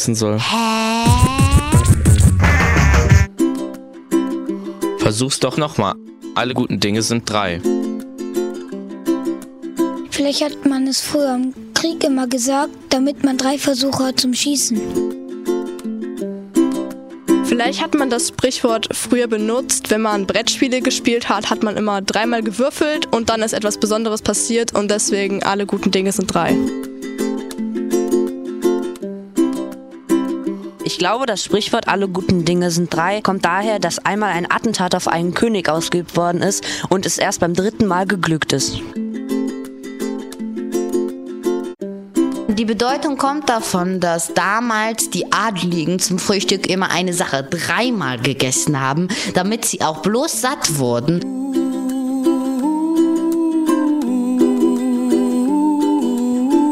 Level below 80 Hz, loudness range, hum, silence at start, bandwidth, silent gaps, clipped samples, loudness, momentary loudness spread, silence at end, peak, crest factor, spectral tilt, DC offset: -32 dBFS; 4 LU; none; 0 s; 16 kHz; none; under 0.1%; -18 LUFS; 9 LU; 0 s; 0 dBFS; 18 dB; -4.5 dB/octave; under 0.1%